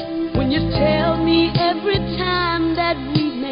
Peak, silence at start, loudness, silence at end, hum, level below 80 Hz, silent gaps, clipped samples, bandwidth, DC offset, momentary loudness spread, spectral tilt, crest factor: -4 dBFS; 0 s; -18 LUFS; 0 s; none; -34 dBFS; none; under 0.1%; 5.4 kHz; under 0.1%; 4 LU; -11 dB/octave; 14 dB